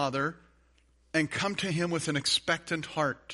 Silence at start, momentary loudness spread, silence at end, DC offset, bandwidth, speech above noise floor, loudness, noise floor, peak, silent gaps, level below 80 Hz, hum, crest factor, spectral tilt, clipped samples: 0 s; 6 LU; 0 s; under 0.1%; 11.5 kHz; 35 dB; -30 LUFS; -65 dBFS; -10 dBFS; none; -62 dBFS; none; 20 dB; -4 dB/octave; under 0.1%